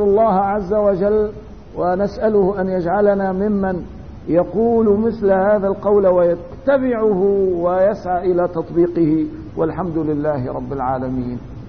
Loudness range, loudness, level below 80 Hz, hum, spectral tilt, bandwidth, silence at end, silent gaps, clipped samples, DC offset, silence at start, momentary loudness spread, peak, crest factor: 3 LU; -17 LUFS; -40 dBFS; none; -10 dB/octave; 6.2 kHz; 0 s; none; under 0.1%; 0.6%; 0 s; 9 LU; -4 dBFS; 14 dB